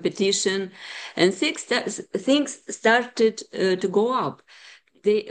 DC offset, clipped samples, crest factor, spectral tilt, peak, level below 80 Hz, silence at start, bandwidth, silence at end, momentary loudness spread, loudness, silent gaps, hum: under 0.1%; under 0.1%; 18 dB; -3.5 dB/octave; -4 dBFS; -74 dBFS; 0 s; 10 kHz; 0 s; 10 LU; -23 LUFS; none; none